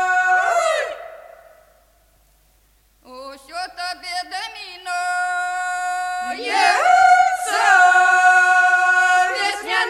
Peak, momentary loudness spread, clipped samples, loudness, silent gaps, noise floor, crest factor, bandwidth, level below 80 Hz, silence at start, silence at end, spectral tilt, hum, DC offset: -2 dBFS; 18 LU; under 0.1%; -16 LUFS; none; -58 dBFS; 16 dB; 14 kHz; -60 dBFS; 0 s; 0 s; 0.5 dB/octave; none; under 0.1%